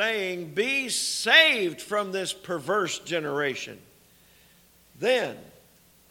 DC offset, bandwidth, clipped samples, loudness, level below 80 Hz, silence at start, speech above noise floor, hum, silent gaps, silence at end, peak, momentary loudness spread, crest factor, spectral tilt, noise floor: under 0.1%; 19 kHz; under 0.1%; -24 LUFS; -70 dBFS; 0 s; 32 dB; none; none; 0.6 s; -2 dBFS; 15 LU; 24 dB; -2 dB/octave; -58 dBFS